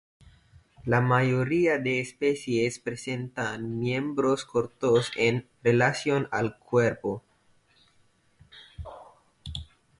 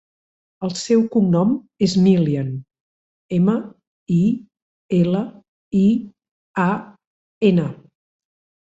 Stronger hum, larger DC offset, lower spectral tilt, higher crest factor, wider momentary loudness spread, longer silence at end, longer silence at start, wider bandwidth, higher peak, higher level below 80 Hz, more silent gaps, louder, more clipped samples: neither; neither; second, -6 dB/octave vs -7.5 dB/octave; about the same, 18 dB vs 16 dB; first, 16 LU vs 13 LU; second, 0.35 s vs 0.95 s; first, 0.85 s vs 0.6 s; first, 11.5 kHz vs 8 kHz; second, -10 dBFS vs -4 dBFS; about the same, -54 dBFS vs -58 dBFS; second, none vs 2.80-3.29 s, 3.87-4.06 s, 4.62-4.89 s, 5.48-5.71 s, 6.31-6.54 s, 7.07-7.41 s; second, -26 LUFS vs -19 LUFS; neither